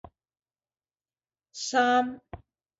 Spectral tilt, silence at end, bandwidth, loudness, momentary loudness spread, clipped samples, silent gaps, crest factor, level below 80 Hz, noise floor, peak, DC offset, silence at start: -2.5 dB/octave; 0.4 s; 8 kHz; -26 LUFS; 22 LU; under 0.1%; none; 20 dB; -62 dBFS; under -90 dBFS; -12 dBFS; under 0.1%; 1.55 s